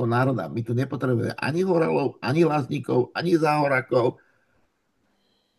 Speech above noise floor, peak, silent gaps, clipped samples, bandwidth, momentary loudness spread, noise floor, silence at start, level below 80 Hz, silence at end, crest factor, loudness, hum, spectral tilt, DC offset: 47 dB; -8 dBFS; none; under 0.1%; 12.5 kHz; 6 LU; -70 dBFS; 0 s; -66 dBFS; 1.45 s; 16 dB; -23 LUFS; none; -7.5 dB/octave; under 0.1%